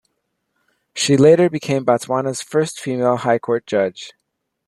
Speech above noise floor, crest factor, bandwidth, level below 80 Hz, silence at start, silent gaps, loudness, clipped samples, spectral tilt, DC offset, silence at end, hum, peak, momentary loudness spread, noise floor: 58 dB; 16 dB; 12.5 kHz; -60 dBFS; 0.95 s; none; -17 LUFS; under 0.1%; -5 dB/octave; under 0.1%; 0.55 s; none; -2 dBFS; 11 LU; -75 dBFS